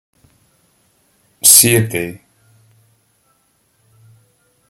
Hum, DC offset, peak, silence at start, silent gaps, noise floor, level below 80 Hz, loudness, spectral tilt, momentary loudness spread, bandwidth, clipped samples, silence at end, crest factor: none; under 0.1%; 0 dBFS; 1.45 s; none; -60 dBFS; -56 dBFS; -9 LUFS; -2.5 dB/octave; 17 LU; over 20 kHz; 0.2%; 2.55 s; 20 dB